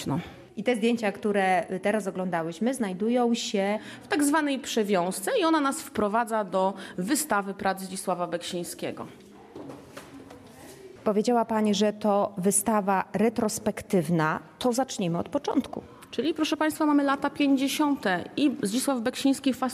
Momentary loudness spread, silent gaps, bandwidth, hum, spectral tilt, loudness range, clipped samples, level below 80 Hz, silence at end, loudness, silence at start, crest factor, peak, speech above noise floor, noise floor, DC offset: 12 LU; none; 15 kHz; none; -4.5 dB/octave; 5 LU; under 0.1%; -64 dBFS; 0 s; -27 LUFS; 0 s; 16 dB; -10 dBFS; 21 dB; -47 dBFS; under 0.1%